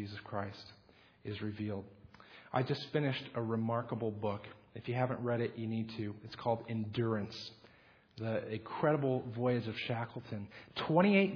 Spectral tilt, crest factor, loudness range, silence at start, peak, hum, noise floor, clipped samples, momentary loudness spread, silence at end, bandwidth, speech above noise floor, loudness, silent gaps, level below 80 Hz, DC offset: -5.5 dB/octave; 22 dB; 3 LU; 0 s; -14 dBFS; none; -64 dBFS; under 0.1%; 12 LU; 0 s; 5.4 kHz; 28 dB; -37 LUFS; none; -72 dBFS; under 0.1%